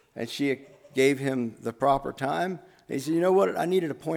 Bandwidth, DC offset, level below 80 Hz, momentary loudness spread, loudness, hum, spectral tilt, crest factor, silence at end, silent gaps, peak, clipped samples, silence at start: 17 kHz; under 0.1%; -60 dBFS; 11 LU; -27 LUFS; none; -5.5 dB/octave; 18 dB; 0 s; none; -10 dBFS; under 0.1%; 0.15 s